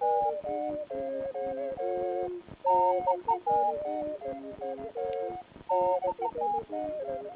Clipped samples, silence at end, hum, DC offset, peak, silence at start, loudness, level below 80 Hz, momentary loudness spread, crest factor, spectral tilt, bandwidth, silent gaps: under 0.1%; 0 s; none; under 0.1%; -16 dBFS; 0 s; -31 LUFS; -64 dBFS; 11 LU; 16 dB; -5.5 dB/octave; 4 kHz; none